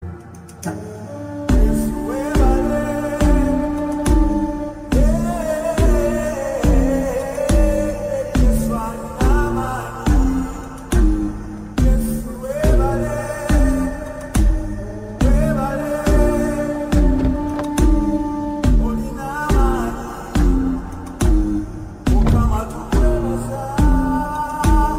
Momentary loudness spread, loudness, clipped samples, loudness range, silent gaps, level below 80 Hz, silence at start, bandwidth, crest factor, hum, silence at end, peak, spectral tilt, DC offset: 10 LU; -19 LUFS; under 0.1%; 2 LU; none; -20 dBFS; 0 s; 16 kHz; 14 dB; none; 0 s; -4 dBFS; -7 dB/octave; under 0.1%